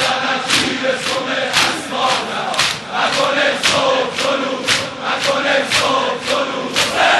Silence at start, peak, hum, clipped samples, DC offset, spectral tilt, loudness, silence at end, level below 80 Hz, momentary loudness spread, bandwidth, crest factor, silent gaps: 0 s; -2 dBFS; none; under 0.1%; under 0.1%; -1.5 dB/octave; -16 LUFS; 0 s; -52 dBFS; 4 LU; 12.5 kHz; 14 dB; none